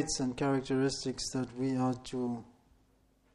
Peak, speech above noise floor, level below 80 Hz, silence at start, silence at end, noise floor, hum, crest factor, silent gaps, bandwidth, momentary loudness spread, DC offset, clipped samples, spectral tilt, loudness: -20 dBFS; 35 dB; -58 dBFS; 0 s; 0.9 s; -69 dBFS; none; 16 dB; none; 12 kHz; 6 LU; under 0.1%; under 0.1%; -5 dB/octave; -34 LUFS